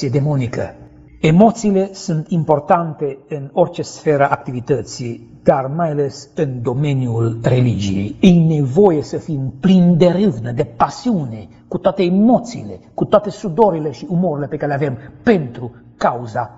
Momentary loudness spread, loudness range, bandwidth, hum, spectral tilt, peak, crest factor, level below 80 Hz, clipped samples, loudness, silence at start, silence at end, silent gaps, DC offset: 12 LU; 4 LU; 8 kHz; none; -7.5 dB/octave; 0 dBFS; 16 dB; -46 dBFS; under 0.1%; -16 LUFS; 0 s; 0.05 s; none; under 0.1%